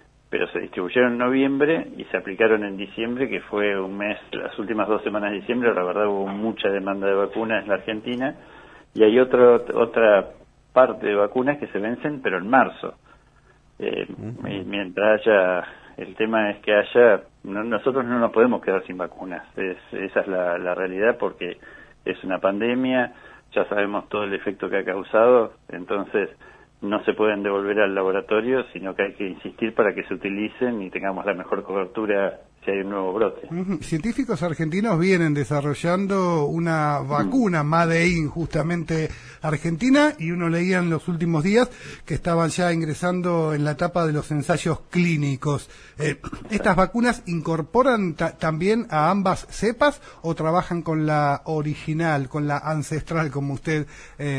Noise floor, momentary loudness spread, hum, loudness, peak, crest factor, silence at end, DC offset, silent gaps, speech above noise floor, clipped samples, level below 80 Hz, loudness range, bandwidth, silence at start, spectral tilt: -55 dBFS; 11 LU; none; -22 LUFS; -2 dBFS; 20 dB; 0 s; under 0.1%; none; 33 dB; under 0.1%; -48 dBFS; 5 LU; 10.5 kHz; 0.3 s; -6.5 dB/octave